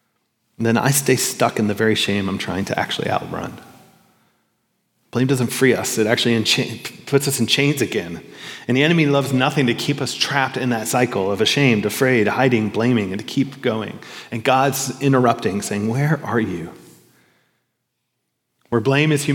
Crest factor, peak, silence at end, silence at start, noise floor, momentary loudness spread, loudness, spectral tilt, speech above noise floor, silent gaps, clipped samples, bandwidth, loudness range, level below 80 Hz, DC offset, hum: 18 dB; 0 dBFS; 0 s; 0.6 s; -74 dBFS; 10 LU; -19 LUFS; -4.5 dB/octave; 56 dB; none; under 0.1%; 18 kHz; 6 LU; -64 dBFS; under 0.1%; none